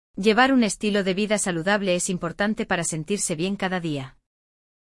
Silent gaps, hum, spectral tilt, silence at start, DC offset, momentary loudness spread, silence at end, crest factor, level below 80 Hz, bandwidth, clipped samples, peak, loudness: none; none; -4 dB/octave; 0.15 s; under 0.1%; 8 LU; 0.85 s; 18 dB; -54 dBFS; 12 kHz; under 0.1%; -6 dBFS; -23 LUFS